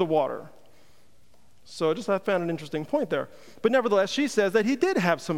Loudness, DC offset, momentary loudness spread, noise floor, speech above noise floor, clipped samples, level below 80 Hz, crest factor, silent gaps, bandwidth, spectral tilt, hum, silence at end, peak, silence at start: -26 LUFS; 0.4%; 8 LU; -62 dBFS; 37 dB; under 0.1%; -68 dBFS; 20 dB; none; 16 kHz; -5 dB/octave; none; 0 s; -8 dBFS; 0 s